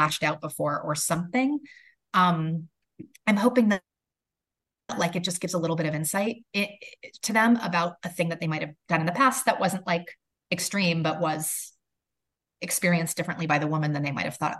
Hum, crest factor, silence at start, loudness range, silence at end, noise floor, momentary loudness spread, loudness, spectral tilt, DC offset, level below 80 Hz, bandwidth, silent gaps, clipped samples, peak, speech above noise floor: none; 22 dB; 0 s; 3 LU; 0 s; -89 dBFS; 10 LU; -26 LUFS; -4.5 dB/octave; under 0.1%; -70 dBFS; 13 kHz; none; under 0.1%; -6 dBFS; 63 dB